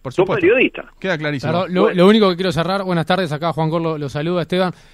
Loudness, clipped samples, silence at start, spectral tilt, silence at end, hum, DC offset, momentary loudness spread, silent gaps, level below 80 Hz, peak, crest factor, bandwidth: -17 LUFS; under 0.1%; 0.05 s; -7 dB/octave; 0.2 s; none; under 0.1%; 9 LU; none; -48 dBFS; 0 dBFS; 16 dB; 13.5 kHz